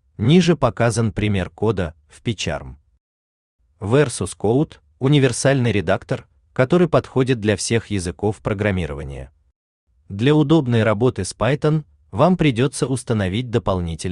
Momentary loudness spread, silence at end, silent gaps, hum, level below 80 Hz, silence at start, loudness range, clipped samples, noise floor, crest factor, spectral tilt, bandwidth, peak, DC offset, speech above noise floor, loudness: 12 LU; 0 s; 3.00-3.59 s, 9.56-9.87 s; none; -44 dBFS; 0.2 s; 5 LU; under 0.1%; under -90 dBFS; 16 dB; -6 dB/octave; 11 kHz; -2 dBFS; under 0.1%; over 72 dB; -19 LUFS